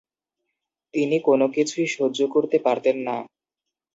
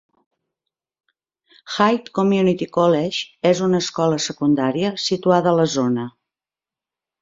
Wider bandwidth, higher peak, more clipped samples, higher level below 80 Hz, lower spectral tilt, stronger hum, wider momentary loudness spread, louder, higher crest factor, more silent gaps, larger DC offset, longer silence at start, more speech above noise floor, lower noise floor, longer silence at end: about the same, 7.8 kHz vs 7.8 kHz; second, -6 dBFS vs -2 dBFS; neither; second, -74 dBFS vs -62 dBFS; about the same, -5 dB/octave vs -5.5 dB/octave; neither; first, 9 LU vs 5 LU; second, -22 LUFS vs -19 LUFS; about the same, 18 dB vs 18 dB; neither; neither; second, 0.95 s vs 1.65 s; second, 65 dB vs 72 dB; second, -86 dBFS vs -90 dBFS; second, 0.7 s vs 1.15 s